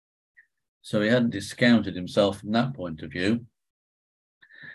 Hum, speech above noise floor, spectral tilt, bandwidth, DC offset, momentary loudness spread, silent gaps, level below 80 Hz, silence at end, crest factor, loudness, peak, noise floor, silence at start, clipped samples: none; over 66 dB; -6 dB/octave; 12 kHz; under 0.1%; 10 LU; 3.70-4.41 s; -56 dBFS; 0 s; 20 dB; -25 LUFS; -6 dBFS; under -90 dBFS; 0.85 s; under 0.1%